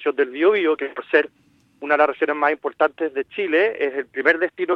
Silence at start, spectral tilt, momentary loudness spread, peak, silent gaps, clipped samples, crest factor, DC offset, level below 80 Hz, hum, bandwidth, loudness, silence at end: 0 s; -5.5 dB/octave; 8 LU; -2 dBFS; none; under 0.1%; 18 dB; under 0.1%; -72 dBFS; none; 5.8 kHz; -20 LUFS; 0 s